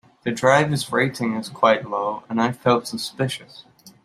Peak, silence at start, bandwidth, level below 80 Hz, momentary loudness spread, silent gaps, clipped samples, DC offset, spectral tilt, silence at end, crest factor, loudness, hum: -2 dBFS; 0.25 s; 15 kHz; -64 dBFS; 9 LU; none; under 0.1%; under 0.1%; -5 dB/octave; 0.15 s; 20 dB; -21 LUFS; none